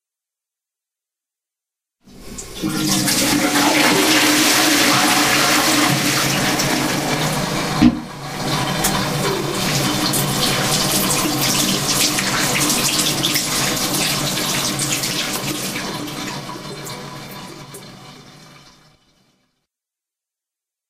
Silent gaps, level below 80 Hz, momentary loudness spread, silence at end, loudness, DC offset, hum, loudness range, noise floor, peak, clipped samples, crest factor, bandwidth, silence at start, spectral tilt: none; -44 dBFS; 17 LU; 2.4 s; -16 LUFS; under 0.1%; none; 13 LU; -87 dBFS; 0 dBFS; under 0.1%; 18 dB; 16 kHz; 2.05 s; -2.5 dB/octave